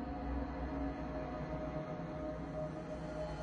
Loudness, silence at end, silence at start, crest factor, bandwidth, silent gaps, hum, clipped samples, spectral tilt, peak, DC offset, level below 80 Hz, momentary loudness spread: -42 LUFS; 0 s; 0 s; 14 dB; 9.4 kHz; none; none; under 0.1%; -8 dB/octave; -28 dBFS; under 0.1%; -48 dBFS; 2 LU